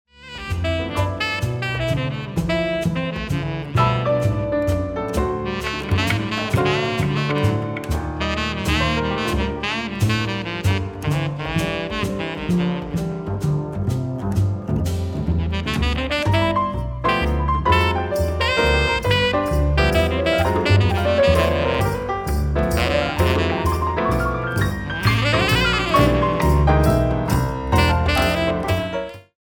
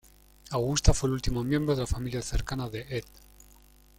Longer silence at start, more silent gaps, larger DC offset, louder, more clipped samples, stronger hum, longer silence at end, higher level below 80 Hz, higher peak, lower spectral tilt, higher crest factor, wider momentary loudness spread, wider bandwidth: second, 0.2 s vs 0.45 s; neither; neither; first, -20 LUFS vs -30 LUFS; neither; neither; second, 0.2 s vs 0.95 s; first, -28 dBFS vs -36 dBFS; first, -2 dBFS vs -6 dBFS; about the same, -6 dB/octave vs -5 dB/octave; about the same, 18 dB vs 22 dB; second, 7 LU vs 10 LU; first, 19.5 kHz vs 16.5 kHz